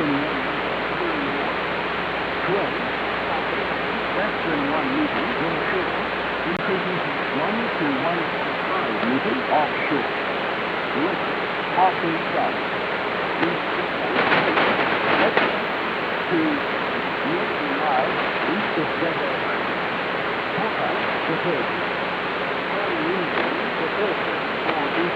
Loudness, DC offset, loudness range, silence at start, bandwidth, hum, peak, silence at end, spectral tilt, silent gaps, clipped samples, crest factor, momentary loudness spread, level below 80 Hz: -22 LUFS; under 0.1%; 3 LU; 0 s; over 20 kHz; none; -2 dBFS; 0 s; -6.5 dB/octave; none; under 0.1%; 22 dB; 4 LU; -52 dBFS